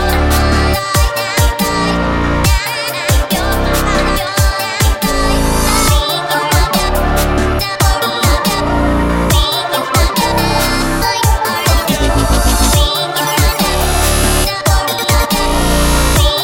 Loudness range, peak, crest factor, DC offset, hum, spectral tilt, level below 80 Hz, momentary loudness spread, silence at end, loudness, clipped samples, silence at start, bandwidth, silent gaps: 1 LU; 0 dBFS; 12 dB; under 0.1%; none; -4 dB/octave; -16 dBFS; 3 LU; 0 s; -13 LUFS; under 0.1%; 0 s; 17 kHz; none